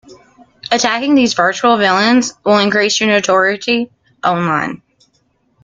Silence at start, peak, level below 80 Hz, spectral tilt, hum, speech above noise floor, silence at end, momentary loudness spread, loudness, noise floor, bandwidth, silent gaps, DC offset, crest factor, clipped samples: 0.1 s; 0 dBFS; -58 dBFS; -3.5 dB/octave; none; 47 dB; 0.85 s; 8 LU; -13 LUFS; -60 dBFS; 9.2 kHz; none; under 0.1%; 14 dB; under 0.1%